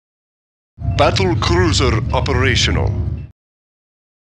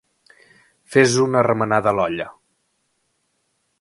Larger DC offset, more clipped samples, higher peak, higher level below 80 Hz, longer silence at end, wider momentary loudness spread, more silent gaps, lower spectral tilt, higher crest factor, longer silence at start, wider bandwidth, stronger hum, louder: neither; neither; about the same, 0 dBFS vs 0 dBFS; first, -26 dBFS vs -58 dBFS; second, 1.1 s vs 1.5 s; about the same, 10 LU vs 10 LU; neither; about the same, -5 dB/octave vs -5 dB/octave; about the same, 18 dB vs 20 dB; about the same, 0.8 s vs 0.9 s; about the same, 10.5 kHz vs 11.5 kHz; neither; about the same, -16 LUFS vs -18 LUFS